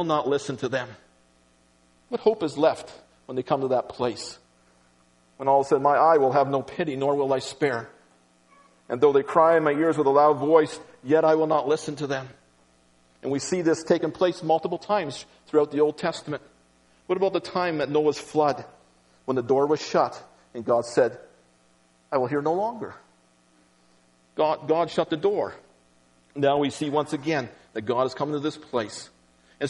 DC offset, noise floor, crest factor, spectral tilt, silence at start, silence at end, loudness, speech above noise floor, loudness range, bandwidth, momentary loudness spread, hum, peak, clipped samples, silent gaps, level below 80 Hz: under 0.1%; -61 dBFS; 20 dB; -5.5 dB/octave; 0 s; 0 s; -24 LUFS; 38 dB; 6 LU; 11.5 kHz; 15 LU; 60 Hz at -60 dBFS; -6 dBFS; under 0.1%; none; -68 dBFS